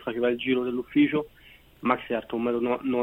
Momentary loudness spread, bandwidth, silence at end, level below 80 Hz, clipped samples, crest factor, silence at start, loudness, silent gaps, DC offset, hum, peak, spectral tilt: 7 LU; 16 kHz; 0 s; -60 dBFS; under 0.1%; 20 dB; 0 s; -26 LUFS; none; under 0.1%; none; -6 dBFS; -7.5 dB/octave